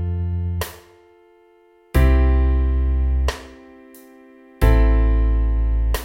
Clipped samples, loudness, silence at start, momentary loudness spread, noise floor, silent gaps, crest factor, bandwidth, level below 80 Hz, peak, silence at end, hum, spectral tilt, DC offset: under 0.1%; -20 LUFS; 0 s; 10 LU; -53 dBFS; none; 18 dB; 16 kHz; -20 dBFS; -2 dBFS; 0 s; none; -7 dB/octave; under 0.1%